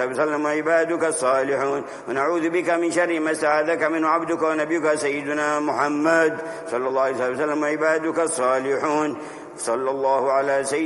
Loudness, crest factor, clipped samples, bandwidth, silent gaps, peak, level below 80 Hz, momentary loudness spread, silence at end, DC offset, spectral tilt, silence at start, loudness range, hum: -22 LUFS; 16 dB; under 0.1%; 11.5 kHz; none; -6 dBFS; -68 dBFS; 5 LU; 0 s; under 0.1%; -4 dB/octave; 0 s; 1 LU; none